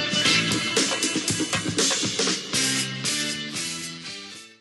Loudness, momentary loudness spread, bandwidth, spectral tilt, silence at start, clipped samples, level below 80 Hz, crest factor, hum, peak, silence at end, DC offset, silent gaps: -23 LUFS; 13 LU; 12.5 kHz; -2 dB/octave; 0 s; under 0.1%; -60 dBFS; 18 dB; none; -8 dBFS; 0.05 s; under 0.1%; none